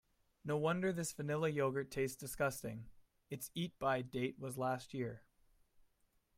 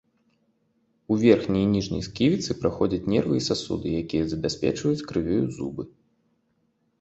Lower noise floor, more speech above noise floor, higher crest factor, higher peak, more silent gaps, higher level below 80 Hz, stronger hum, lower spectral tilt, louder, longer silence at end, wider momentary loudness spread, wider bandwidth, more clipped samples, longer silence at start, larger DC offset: first, -77 dBFS vs -70 dBFS; second, 38 dB vs 46 dB; about the same, 18 dB vs 22 dB; second, -24 dBFS vs -4 dBFS; neither; second, -68 dBFS vs -48 dBFS; neither; about the same, -5.5 dB/octave vs -6 dB/octave; second, -40 LUFS vs -25 LUFS; about the same, 1.2 s vs 1.1 s; about the same, 11 LU vs 9 LU; first, 16 kHz vs 8.2 kHz; neither; second, 0.45 s vs 1.1 s; neither